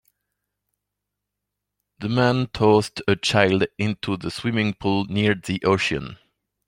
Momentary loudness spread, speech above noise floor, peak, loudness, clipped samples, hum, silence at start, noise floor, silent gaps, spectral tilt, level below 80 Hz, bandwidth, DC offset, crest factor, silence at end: 9 LU; 61 dB; -2 dBFS; -22 LUFS; under 0.1%; 50 Hz at -45 dBFS; 2 s; -83 dBFS; none; -5.5 dB/octave; -52 dBFS; 16 kHz; under 0.1%; 22 dB; 0.55 s